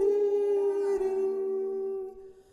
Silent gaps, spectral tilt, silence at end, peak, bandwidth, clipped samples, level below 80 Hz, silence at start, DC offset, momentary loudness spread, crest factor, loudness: none; -5.5 dB/octave; 0.2 s; -16 dBFS; 10 kHz; under 0.1%; -64 dBFS; 0 s; under 0.1%; 9 LU; 12 dB; -29 LUFS